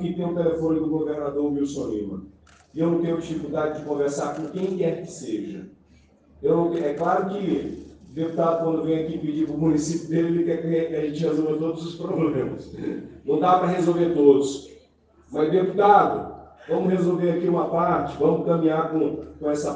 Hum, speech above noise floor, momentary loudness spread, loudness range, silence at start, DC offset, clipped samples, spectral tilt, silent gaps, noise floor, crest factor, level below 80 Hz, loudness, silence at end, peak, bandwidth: none; 34 dB; 12 LU; 6 LU; 0 s; under 0.1%; under 0.1%; -7 dB/octave; none; -57 dBFS; 20 dB; -56 dBFS; -23 LUFS; 0 s; -4 dBFS; 9.4 kHz